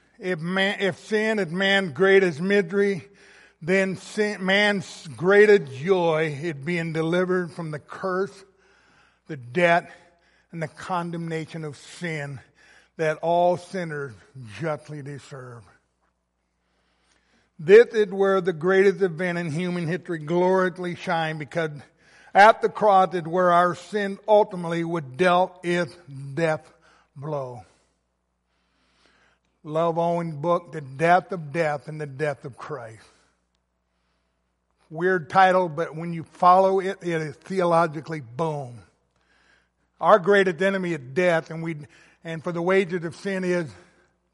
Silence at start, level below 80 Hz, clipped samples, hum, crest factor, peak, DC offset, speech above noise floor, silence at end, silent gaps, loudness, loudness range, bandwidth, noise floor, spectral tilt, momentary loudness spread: 0.2 s; -70 dBFS; under 0.1%; none; 22 dB; -2 dBFS; under 0.1%; 51 dB; 0.6 s; none; -23 LUFS; 11 LU; 11.5 kHz; -74 dBFS; -6 dB/octave; 18 LU